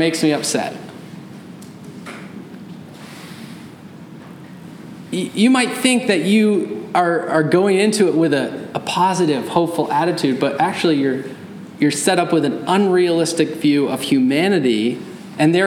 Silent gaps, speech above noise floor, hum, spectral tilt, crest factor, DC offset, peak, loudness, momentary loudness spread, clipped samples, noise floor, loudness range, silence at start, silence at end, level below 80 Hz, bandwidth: none; 21 dB; none; -5 dB/octave; 16 dB; under 0.1%; -2 dBFS; -17 LUFS; 21 LU; under 0.1%; -37 dBFS; 19 LU; 0 s; 0 s; -68 dBFS; 17 kHz